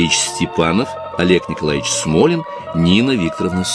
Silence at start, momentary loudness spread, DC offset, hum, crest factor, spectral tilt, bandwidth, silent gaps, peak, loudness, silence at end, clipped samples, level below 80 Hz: 0 s; 6 LU; under 0.1%; none; 16 dB; -4.5 dB/octave; 11 kHz; none; 0 dBFS; -16 LUFS; 0 s; under 0.1%; -42 dBFS